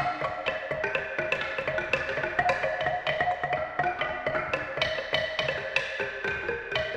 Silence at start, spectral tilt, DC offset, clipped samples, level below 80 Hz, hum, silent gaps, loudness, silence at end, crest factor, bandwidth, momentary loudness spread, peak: 0 s; -4 dB/octave; under 0.1%; under 0.1%; -54 dBFS; none; none; -29 LUFS; 0 s; 20 dB; 11.5 kHz; 4 LU; -10 dBFS